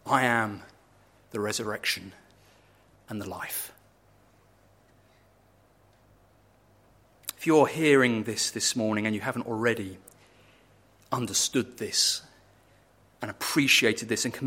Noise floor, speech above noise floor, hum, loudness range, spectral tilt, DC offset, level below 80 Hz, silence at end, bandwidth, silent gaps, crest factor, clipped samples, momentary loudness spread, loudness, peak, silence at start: -62 dBFS; 35 dB; none; 15 LU; -3 dB/octave; under 0.1%; -68 dBFS; 0 s; 16.5 kHz; none; 22 dB; under 0.1%; 18 LU; -26 LUFS; -6 dBFS; 0.05 s